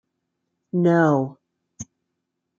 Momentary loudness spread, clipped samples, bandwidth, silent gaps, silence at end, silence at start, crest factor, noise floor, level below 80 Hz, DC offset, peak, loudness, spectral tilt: 23 LU; under 0.1%; 7.4 kHz; none; 0.75 s; 0.75 s; 20 dB; -79 dBFS; -68 dBFS; under 0.1%; -4 dBFS; -20 LUFS; -8 dB/octave